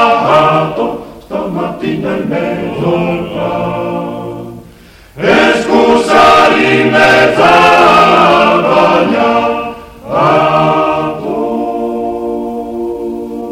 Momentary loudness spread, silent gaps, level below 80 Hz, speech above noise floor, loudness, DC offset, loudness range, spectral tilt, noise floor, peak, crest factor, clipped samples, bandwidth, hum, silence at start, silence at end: 14 LU; none; -40 dBFS; 23 dB; -10 LUFS; under 0.1%; 10 LU; -5.5 dB/octave; -38 dBFS; 0 dBFS; 10 dB; 0.2%; 16 kHz; none; 0 s; 0 s